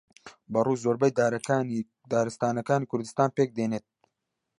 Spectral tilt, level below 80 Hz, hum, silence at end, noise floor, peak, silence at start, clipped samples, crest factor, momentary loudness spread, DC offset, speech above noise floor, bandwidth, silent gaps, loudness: -6.5 dB/octave; -70 dBFS; none; 0.8 s; -83 dBFS; -8 dBFS; 0.25 s; under 0.1%; 20 dB; 7 LU; under 0.1%; 56 dB; 11.5 kHz; none; -27 LUFS